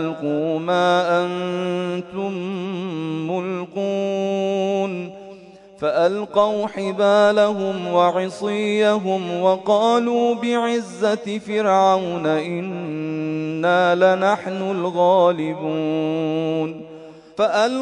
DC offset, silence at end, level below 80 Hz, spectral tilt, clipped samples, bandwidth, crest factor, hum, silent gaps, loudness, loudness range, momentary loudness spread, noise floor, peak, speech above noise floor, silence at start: under 0.1%; 0 s; -68 dBFS; -6 dB/octave; under 0.1%; 10.5 kHz; 16 dB; none; none; -20 LUFS; 5 LU; 10 LU; -43 dBFS; -4 dBFS; 24 dB; 0 s